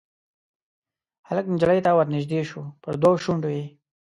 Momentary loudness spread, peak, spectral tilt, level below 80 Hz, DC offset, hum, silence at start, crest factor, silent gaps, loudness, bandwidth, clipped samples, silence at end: 13 LU; -6 dBFS; -7.5 dB/octave; -60 dBFS; under 0.1%; none; 1.3 s; 18 dB; none; -23 LUFS; 11 kHz; under 0.1%; 0.45 s